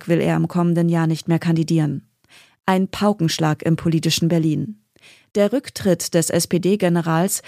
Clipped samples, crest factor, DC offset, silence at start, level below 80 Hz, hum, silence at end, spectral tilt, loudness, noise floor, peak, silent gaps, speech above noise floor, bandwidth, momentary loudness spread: under 0.1%; 16 dB; under 0.1%; 0 s; -56 dBFS; none; 0.05 s; -5.5 dB/octave; -19 LUFS; -52 dBFS; -4 dBFS; none; 33 dB; 15.5 kHz; 4 LU